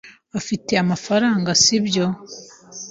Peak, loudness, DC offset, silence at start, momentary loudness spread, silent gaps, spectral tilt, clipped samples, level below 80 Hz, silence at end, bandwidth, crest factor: -2 dBFS; -18 LUFS; under 0.1%; 0.05 s; 22 LU; none; -3.5 dB/octave; under 0.1%; -56 dBFS; 0 s; 7.8 kHz; 18 dB